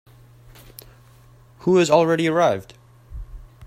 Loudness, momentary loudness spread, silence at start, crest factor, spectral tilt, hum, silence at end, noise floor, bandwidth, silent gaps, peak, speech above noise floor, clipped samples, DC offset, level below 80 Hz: -19 LUFS; 25 LU; 1.65 s; 20 dB; -5.5 dB/octave; none; 0 s; -50 dBFS; 16 kHz; none; -2 dBFS; 32 dB; under 0.1%; under 0.1%; -44 dBFS